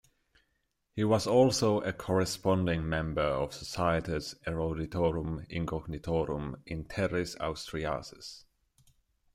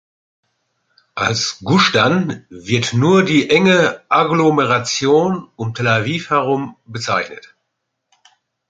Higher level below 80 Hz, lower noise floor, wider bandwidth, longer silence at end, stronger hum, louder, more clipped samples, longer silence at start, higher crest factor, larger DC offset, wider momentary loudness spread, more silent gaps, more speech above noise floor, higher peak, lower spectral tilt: about the same, -50 dBFS vs -54 dBFS; first, -78 dBFS vs -74 dBFS; first, 15.5 kHz vs 9.2 kHz; second, 0.95 s vs 1.35 s; neither; second, -31 LUFS vs -15 LUFS; neither; second, 0.95 s vs 1.15 s; about the same, 20 dB vs 16 dB; neither; about the same, 12 LU vs 12 LU; neither; second, 47 dB vs 59 dB; second, -12 dBFS vs -2 dBFS; about the same, -5.5 dB/octave vs -5 dB/octave